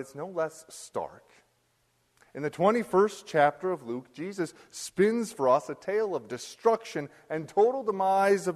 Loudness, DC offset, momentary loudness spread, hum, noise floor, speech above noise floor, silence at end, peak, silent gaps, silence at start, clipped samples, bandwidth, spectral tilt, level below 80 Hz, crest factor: -28 LUFS; under 0.1%; 13 LU; none; -71 dBFS; 43 dB; 0 s; -10 dBFS; none; 0 s; under 0.1%; 13.5 kHz; -5 dB/octave; -74 dBFS; 20 dB